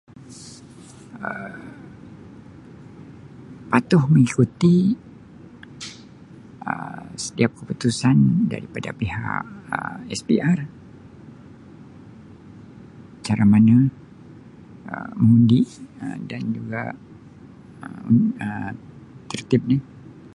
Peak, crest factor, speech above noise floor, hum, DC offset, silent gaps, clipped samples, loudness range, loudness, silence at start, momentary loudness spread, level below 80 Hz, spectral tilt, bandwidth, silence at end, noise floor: -2 dBFS; 20 dB; 25 dB; none; under 0.1%; none; under 0.1%; 8 LU; -21 LUFS; 0.3 s; 26 LU; -52 dBFS; -7 dB/octave; 11.5 kHz; 0.1 s; -44 dBFS